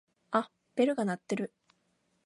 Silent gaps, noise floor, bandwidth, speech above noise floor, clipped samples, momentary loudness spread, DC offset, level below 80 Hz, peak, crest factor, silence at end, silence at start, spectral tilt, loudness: none; -75 dBFS; 11.5 kHz; 45 dB; under 0.1%; 9 LU; under 0.1%; -82 dBFS; -14 dBFS; 20 dB; 0.8 s; 0.3 s; -6 dB/octave; -33 LUFS